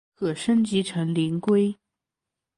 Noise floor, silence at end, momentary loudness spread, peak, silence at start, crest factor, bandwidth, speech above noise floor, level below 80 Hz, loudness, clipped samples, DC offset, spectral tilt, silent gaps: -87 dBFS; 0.85 s; 6 LU; -12 dBFS; 0.2 s; 14 dB; 11.5 kHz; 64 dB; -64 dBFS; -24 LUFS; under 0.1%; under 0.1%; -6.5 dB/octave; none